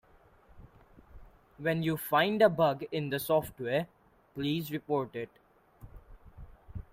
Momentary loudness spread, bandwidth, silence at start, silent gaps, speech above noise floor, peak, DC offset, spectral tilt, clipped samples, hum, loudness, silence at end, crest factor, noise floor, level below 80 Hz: 20 LU; 16 kHz; 0.55 s; none; 31 dB; -12 dBFS; under 0.1%; -6 dB/octave; under 0.1%; none; -31 LUFS; 0.1 s; 22 dB; -61 dBFS; -58 dBFS